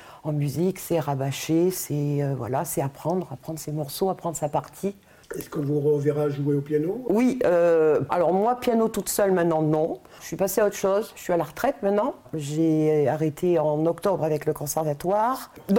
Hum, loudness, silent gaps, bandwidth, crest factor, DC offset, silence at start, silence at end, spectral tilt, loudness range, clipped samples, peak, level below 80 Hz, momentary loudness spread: none; -24 LUFS; none; 17 kHz; 14 dB; under 0.1%; 0 s; 0 s; -6 dB/octave; 6 LU; under 0.1%; -10 dBFS; -58 dBFS; 9 LU